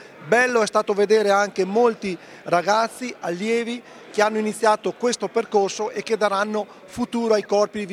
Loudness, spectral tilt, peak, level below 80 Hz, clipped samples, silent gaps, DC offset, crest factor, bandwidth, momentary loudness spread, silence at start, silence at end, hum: -21 LUFS; -4 dB/octave; -4 dBFS; -66 dBFS; under 0.1%; none; under 0.1%; 18 dB; 14.5 kHz; 11 LU; 0 s; 0 s; none